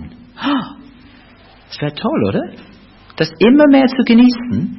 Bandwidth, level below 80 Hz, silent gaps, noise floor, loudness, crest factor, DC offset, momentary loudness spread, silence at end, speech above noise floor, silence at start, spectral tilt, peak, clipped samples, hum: 6 kHz; -48 dBFS; none; -44 dBFS; -13 LUFS; 14 dB; under 0.1%; 15 LU; 0 s; 32 dB; 0 s; -8 dB/octave; -2 dBFS; under 0.1%; none